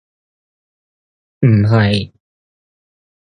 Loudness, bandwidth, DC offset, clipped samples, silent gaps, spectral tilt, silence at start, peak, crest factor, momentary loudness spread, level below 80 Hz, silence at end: -14 LUFS; 9.6 kHz; under 0.1%; under 0.1%; none; -8 dB/octave; 1.4 s; 0 dBFS; 18 dB; 10 LU; -44 dBFS; 1.15 s